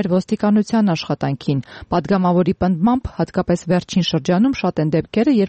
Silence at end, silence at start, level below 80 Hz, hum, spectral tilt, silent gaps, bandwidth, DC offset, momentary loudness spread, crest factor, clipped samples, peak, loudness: 0 s; 0 s; -42 dBFS; none; -7 dB/octave; none; 8.6 kHz; under 0.1%; 6 LU; 10 dB; under 0.1%; -6 dBFS; -18 LUFS